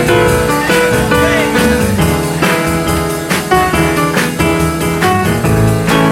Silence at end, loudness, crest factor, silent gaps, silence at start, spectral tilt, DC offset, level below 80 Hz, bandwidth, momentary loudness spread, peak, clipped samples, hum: 0 s; -12 LUFS; 12 dB; none; 0 s; -5 dB/octave; under 0.1%; -28 dBFS; 16.5 kHz; 3 LU; 0 dBFS; under 0.1%; none